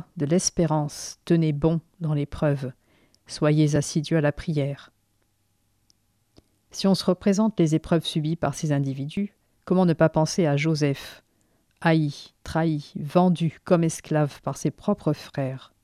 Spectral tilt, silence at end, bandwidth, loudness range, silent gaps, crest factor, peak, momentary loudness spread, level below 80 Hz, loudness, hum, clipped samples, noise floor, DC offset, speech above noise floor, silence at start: -6 dB/octave; 0.2 s; 13 kHz; 3 LU; none; 18 dB; -6 dBFS; 9 LU; -52 dBFS; -24 LUFS; none; under 0.1%; -69 dBFS; under 0.1%; 46 dB; 0.15 s